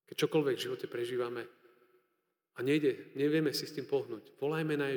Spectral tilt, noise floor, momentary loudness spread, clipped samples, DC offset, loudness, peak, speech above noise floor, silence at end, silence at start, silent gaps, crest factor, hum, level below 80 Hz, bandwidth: -5.5 dB/octave; -82 dBFS; 10 LU; under 0.1%; under 0.1%; -34 LUFS; -18 dBFS; 48 dB; 0 s; 0.1 s; none; 16 dB; none; under -90 dBFS; over 20 kHz